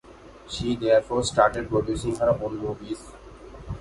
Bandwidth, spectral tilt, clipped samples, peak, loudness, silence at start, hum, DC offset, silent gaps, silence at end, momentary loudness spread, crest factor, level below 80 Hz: 11.5 kHz; -5 dB/octave; under 0.1%; -4 dBFS; -24 LUFS; 0.05 s; none; under 0.1%; none; 0 s; 22 LU; 22 dB; -44 dBFS